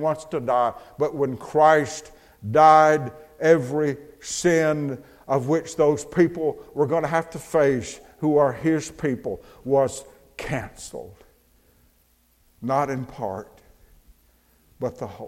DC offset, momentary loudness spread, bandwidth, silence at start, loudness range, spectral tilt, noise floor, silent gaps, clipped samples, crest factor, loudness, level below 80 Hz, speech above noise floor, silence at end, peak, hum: under 0.1%; 18 LU; 16 kHz; 0 s; 12 LU; -5.5 dB/octave; -62 dBFS; none; under 0.1%; 20 dB; -22 LUFS; -54 dBFS; 40 dB; 0 s; -2 dBFS; none